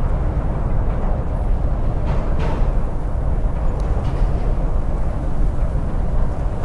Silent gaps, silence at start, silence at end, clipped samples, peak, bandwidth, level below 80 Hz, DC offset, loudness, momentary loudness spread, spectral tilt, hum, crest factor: none; 0 s; 0 s; under 0.1%; -6 dBFS; 4.9 kHz; -20 dBFS; under 0.1%; -23 LUFS; 2 LU; -9 dB/octave; none; 12 dB